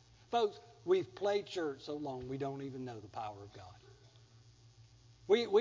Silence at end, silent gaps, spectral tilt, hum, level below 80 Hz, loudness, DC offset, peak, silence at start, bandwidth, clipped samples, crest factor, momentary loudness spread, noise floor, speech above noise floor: 0 s; none; -5.5 dB/octave; none; -70 dBFS; -38 LUFS; under 0.1%; -18 dBFS; 0.3 s; 7.6 kHz; under 0.1%; 20 dB; 19 LU; -62 dBFS; 26 dB